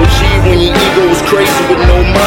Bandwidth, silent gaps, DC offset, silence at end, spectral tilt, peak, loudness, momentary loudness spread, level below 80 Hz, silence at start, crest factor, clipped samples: 17.5 kHz; none; under 0.1%; 0 s; -5 dB/octave; 0 dBFS; -9 LUFS; 1 LU; -14 dBFS; 0 s; 8 dB; 0.7%